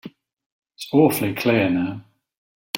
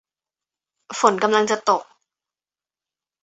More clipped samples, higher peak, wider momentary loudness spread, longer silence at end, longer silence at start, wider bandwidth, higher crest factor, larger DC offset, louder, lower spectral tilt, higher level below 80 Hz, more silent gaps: neither; about the same, -4 dBFS vs -2 dBFS; first, 16 LU vs 6 LU; second, 0 s vs 1.4 s; second, 0.05 s vs 0.9 s; first, 16.5 kHz vs 8.2 kHz; about the same, 20 dB vs 22 dB; neither; about the same, -20 LUFS vs -19 LUFS; first, -5.5 dB/octave vs -3 dB/octave; first, -62 dBFS vs -70 dBFS; first, 0.33-0.37 s, 0.46-0.62 s, 2.37-2.74 s vs none